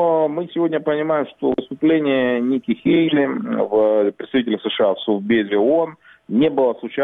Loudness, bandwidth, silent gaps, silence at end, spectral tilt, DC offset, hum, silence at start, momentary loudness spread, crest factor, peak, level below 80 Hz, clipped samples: -19 LUFS; 4 kHz; none; 0 s; -9 dB/octave; under 0.1%; none; 0 s; 5 LU; 12 dB; -6 dBFS; -60 dBFS; under 0.1%